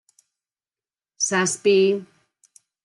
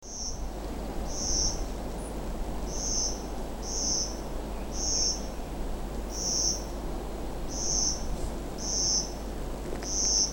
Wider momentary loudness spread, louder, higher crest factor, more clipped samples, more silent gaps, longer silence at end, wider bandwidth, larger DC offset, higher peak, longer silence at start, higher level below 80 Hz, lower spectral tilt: second, 8 LU vs 12 LU; first, -20 LUFS vs -30 LUFS; about the same, 16 dB vs 18 dB; neither; neither; first, 0.8 s vs 0 s; second, 12 kHz vs 17.5 kHz; neither; first, -8 dBFS vs -12 dBFS; first, 1.2 s vs 0 s; second, -78 dBFS vs -36 dBFS; about the same, -3 dB/octave vs -2 dB/octave